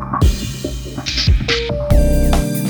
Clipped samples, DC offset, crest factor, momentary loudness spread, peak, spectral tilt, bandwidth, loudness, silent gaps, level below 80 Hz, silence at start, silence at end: under 0.1%; under 0.1%; 14 dB; 9 LU; 0 dBFS; -5 dB/octave; over 20 kHz; -17 LUFS; none; -18 dBFS; 0 s; 0 s